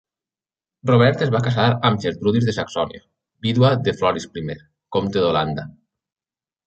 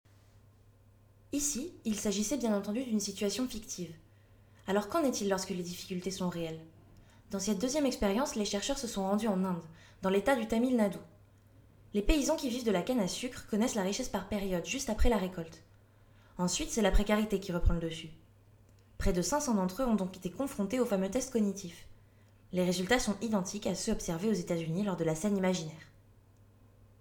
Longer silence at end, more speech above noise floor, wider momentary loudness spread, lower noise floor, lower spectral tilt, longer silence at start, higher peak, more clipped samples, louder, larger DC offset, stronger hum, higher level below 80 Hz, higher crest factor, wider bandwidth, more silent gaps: second, 1 s vs 1.15 s; first, over 71 dB vs 30 dB; first, 13 LU vs 10 LU; first, under -90 dBFS vs -62 dBFS; first, -7 dB/octave vs -4.5 dB/octave; second, 0.85 s vs 1.35 s; first, -2 dBFS vs -12 dBFS; neither; first, -20 LUFS vs -33 LUFS; neither; neither; second, -50 dBFS vs -44 dBFS; about the same, 18 dB vs 20 dB; second, 8.2 kHz vs over 20 kHz; neither